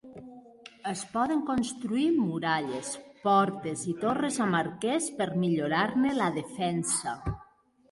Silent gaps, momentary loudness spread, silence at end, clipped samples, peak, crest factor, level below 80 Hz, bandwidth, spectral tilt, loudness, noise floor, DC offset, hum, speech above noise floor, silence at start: none; 11 LU; 0.5 s; under 0.1%; -12 dBFS; 18 dB; -56 dBFS; 11.5 kHz; -4.5 dB/octave; -29 LUFS; -59 dBFS; under 0.1%; none; 31 dB; 0.05 s